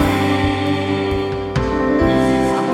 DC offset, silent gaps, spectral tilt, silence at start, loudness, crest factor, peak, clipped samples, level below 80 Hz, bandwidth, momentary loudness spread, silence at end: under 0.1%; none; -6.5 dB/octave; 0 s; -17 LUFS; 14 dB; -2 dBFS; under 0.1%; -32 dBFS; 17 kHz; 5 LU; 0 s